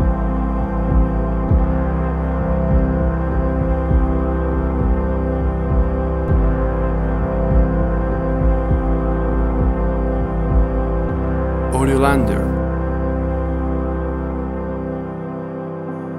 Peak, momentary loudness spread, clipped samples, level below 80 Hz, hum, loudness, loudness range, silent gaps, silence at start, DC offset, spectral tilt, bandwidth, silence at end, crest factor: -2 dBFS; 6 LU; under 0.1%; -20 dBFS; none; -19 LUFS; 1 LU; none; 0 s; under 0.1%; -9 dB/octave; 11.5 kHz; 0 s; 16 dB